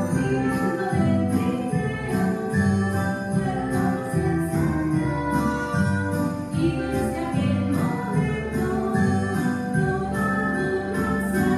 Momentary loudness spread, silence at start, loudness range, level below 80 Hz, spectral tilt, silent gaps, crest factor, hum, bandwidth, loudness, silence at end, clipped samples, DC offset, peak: 3 LU; 0 s; 1 LU; -42 dBFS; -7 dB/octave; none; 14 dB; none; 15 kHz; -24 LUFS; 0 s; under 0.1%; under 0.1%; -10 dBFS